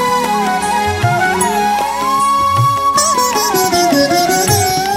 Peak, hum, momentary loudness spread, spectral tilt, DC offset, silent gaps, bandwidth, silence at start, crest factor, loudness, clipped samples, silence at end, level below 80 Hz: -2 dBFS; none; 3 LU; -3.5 dB/octave; under 0.1%; none; 16.5 kHz; 0 s; 12 dB; -13 LUFS; under 0.1%; 0 s; -40 dBFS